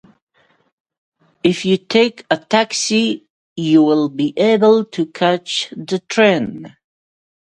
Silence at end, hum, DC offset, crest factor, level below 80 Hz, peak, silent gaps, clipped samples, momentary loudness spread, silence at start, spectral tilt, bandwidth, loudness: 0.85 s; none; under 0.1%; 18 dB; -62 dBFS; 0 dBFS; 3.30-3.56 s; under 0.1%; 11 LU; 1.45 s; -4.5 dB/octave; 11.5 kHz; -16 LUFS